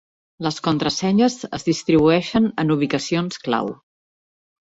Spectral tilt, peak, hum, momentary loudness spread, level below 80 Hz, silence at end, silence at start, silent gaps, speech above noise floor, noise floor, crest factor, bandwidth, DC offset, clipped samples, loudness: -5.5 dB/octave; -4 dBFS; none; 8 LU; -54 dBFS; 0.95 s; 0.4 s; none; over 71 dB; under -90 dBFS; 16 dB; 8 kHz; under 0.1%; under 0.1%; -20 LUFS